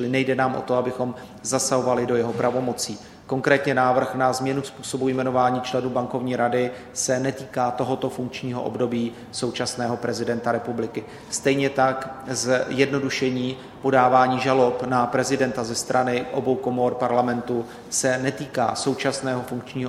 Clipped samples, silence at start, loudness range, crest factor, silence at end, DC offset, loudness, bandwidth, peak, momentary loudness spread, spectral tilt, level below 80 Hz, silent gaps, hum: under 0.1%; 0 s; 5 LU; 20 dB; 0 s; under 0.1%; -23 LUFS; 14.5 kHz; -2 dBFS; 9 LU; -4.5 dB/octave; -58 dBFS; none; none